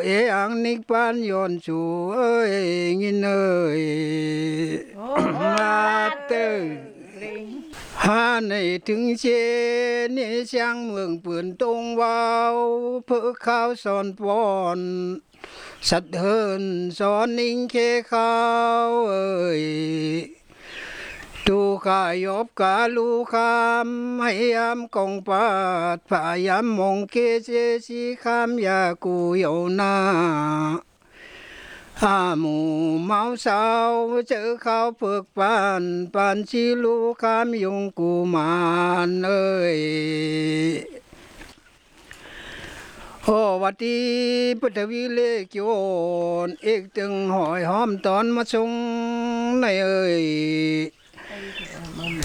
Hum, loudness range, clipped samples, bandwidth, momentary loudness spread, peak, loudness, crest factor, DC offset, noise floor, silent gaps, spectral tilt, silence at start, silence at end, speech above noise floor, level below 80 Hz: none; 3 LU; under 0.1%; 12 kHz; 11 LU; -4 dBFS; -22 LUFS; 18 dB; under 0.1%; -53 dBFS; none; -5.5 dB/octave; 0 s; 0 s; 31 dB; -56 dBFS